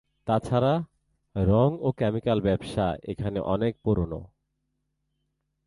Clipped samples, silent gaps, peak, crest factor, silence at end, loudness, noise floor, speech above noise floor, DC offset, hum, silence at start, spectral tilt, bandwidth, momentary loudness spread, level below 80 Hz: under 0.1%; none; -10 dBFS; 18 dB; 1.4 s; -26 LUFS; -78 dBFS; 52 dB; under 0.1%; none; 0.25 s; -8.5 dB/octave; 11.5 kHz; 9 LU; -44 dBFS